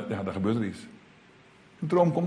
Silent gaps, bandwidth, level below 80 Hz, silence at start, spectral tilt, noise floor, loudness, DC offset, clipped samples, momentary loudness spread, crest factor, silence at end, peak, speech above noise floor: none; 10.5 kHz; -64 dBFS; 0 s; -8.5 dB/octave; -56 dBFS; -28 LUFS; under 0.1%; under 0.1%; 19 LU; 20 dB; 0 s; -10 dBFS; 29 dB